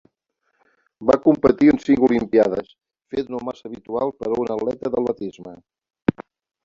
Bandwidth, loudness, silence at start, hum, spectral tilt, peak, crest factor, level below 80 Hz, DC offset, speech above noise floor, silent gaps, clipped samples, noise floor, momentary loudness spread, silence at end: 7.4 kHz; -20 LUFS; 1 s; none; -8 dB/octave; -2 dBFS; 20 dB; -52 dBFS; under 0.1%; 53 dB; none; under 0.1%; -72 dBFS; 14 LU; 0.45 s